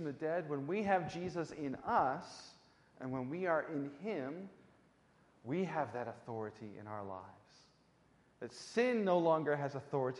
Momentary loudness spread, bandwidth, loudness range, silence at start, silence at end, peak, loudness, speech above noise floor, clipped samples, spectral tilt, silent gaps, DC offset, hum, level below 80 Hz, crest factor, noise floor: 18 LU; 11.5 kHz; 7 LU; 0 s; 0 s; -18 dBFS; -38 LUFS; 32 dB; under 0.1%; -6.5 dB/octave; none; under 0.1%; none; -76 dBFS; 20 dB; -70 dBFS